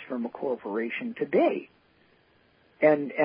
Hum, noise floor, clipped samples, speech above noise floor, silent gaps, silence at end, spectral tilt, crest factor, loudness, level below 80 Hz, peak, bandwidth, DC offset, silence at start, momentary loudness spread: none; -63 dBFS; under 0.1%; 37 dB; none; 0 s; -10 dB/octave; 20 dB; -27 LUFS; -78 dBFS; -8 dBFS; 5.2 kHz; under 0.1%; 0 s; 9 LU